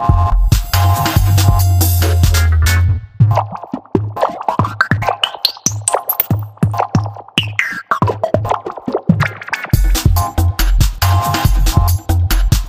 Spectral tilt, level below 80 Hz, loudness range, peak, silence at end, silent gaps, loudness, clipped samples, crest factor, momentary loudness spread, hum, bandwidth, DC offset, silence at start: -4.5 dB/octave; -18 dBFS; 4 LU; 0 dBFS; 0 s; none; -15 LUFS; under 0.1%; 14 dB; 6 LU; none; 16.5 kHz; under 0.1%; 0 s